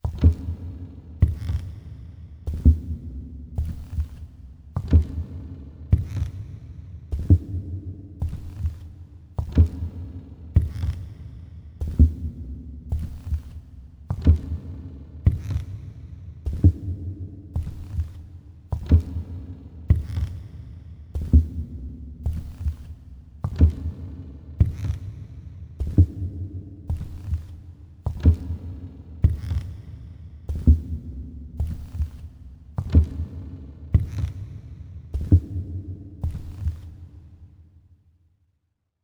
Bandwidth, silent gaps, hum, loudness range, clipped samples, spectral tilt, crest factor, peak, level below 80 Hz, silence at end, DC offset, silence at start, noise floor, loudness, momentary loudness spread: 4.5 kHz; none; none; 3 LU; under 0.1%; -9.5 dB/octave; 20 dB; -4 dBFS; -28 dBFS; 1.4 s; under 0.1%; 0.05 s; -74 dBFS; -26 LUFS; 20 LU